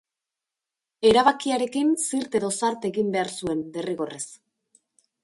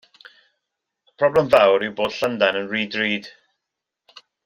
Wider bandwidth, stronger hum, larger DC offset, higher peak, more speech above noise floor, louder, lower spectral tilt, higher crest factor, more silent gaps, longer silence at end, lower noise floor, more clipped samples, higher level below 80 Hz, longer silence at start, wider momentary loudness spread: second, 11.5 kHz vs 15.5 kHz; neither; neither; second, -6 dBFS vs -2 dBFS; about the same, 64 dB vs 64 dB; second, -24 LUFS vs -19 LUFS; second, -3.5 dB/octave vs -5 dB/octave; about the same, 20 dB vs 20 dB; neither; second, 0.9 s vs 1.15 s; first, -88 dBFS vs -83 dBFS; neither; about the same, -60 dBFS vs -60 dBFS; second, 1 s vs 1.2 s; first, 12 LU vs 9 LU